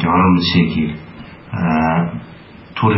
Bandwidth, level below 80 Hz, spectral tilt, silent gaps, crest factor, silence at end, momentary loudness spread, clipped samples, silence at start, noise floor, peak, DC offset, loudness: 5.8 kHz; -42 dBFS; -5 dB/octave; none; 16 dB; 0 s; 19 LU; under 0.1%; 0 s; -38 dBFS; -2 dBFS; under 0.1%; -16 LUFS